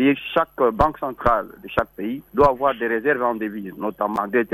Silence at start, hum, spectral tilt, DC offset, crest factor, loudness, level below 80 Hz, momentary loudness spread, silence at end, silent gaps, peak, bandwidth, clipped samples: 0 s; none; -7.5 dB/octave; under 0.1%; 16 dB; -22 LUFS; -42 dBFS; 9 LU; 0.05 s; none; -4 dBFS; 13 kHz; under 0.1%